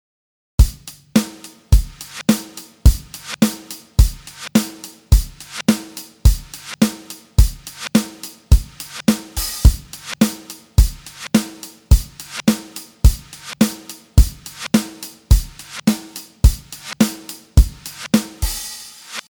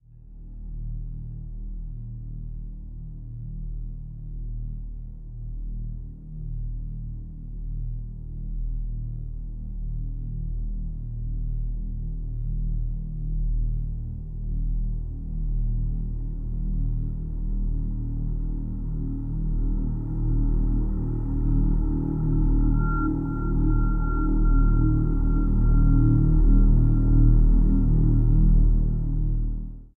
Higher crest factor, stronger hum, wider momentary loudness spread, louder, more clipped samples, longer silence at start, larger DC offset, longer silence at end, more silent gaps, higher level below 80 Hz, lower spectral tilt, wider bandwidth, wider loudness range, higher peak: about the same, 18 dB vs 16 dB; neither; about the same, 15 LU vs 17 LU; first, -19 LUFS vs -27 LUFS; neither; first, 0.6 s vs 0.15 s; neither; about the same, 0.1 s vs 0.1 s; neither; about the same, -20 dBFS vs -24 dBFS; second, -5 dB/octave vs -13 dB/octave; first, over 20 kHz vs 1.5 kHz; second, 1 LU vs 16 LU; first, 0 dBFS vs -6 dBFS